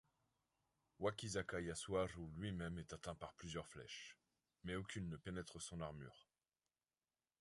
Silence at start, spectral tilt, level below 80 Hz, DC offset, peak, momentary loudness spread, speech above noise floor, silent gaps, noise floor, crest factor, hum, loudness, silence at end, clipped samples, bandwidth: 1 s; -4.5 dB/octave; -66 dBFS; under 0.1%; -28 dBFS; 10 LU; over 42 dB; none; under -90 dBFS; 22 dB; none; -49 LUFS; 1.2 s; under 0.1%; 11.5 kHz